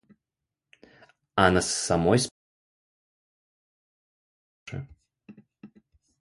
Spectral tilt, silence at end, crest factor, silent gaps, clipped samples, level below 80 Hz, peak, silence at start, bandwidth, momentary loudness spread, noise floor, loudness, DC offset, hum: -4 dB/octave; 0.55 s; 26 dB; 2.31-4.66 s; under 0.1%; -50 dBFS; -4 dBFS; 1.35 s; 11.5 kHz; 19 LU; -87 dBFS; -24 LUFS; under 0.1%; none